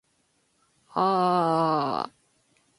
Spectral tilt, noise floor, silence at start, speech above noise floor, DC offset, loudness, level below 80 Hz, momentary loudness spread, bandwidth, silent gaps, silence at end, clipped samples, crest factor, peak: -7 dB/octave; -70 dBFS; 0.95 s; 46 dB; under 0.1%; -25 LUFS; -72 dBFS; 11 LU; 11.5 kHz; none; 0.7 s; under 0.1%; 18 dB; -10 dBFS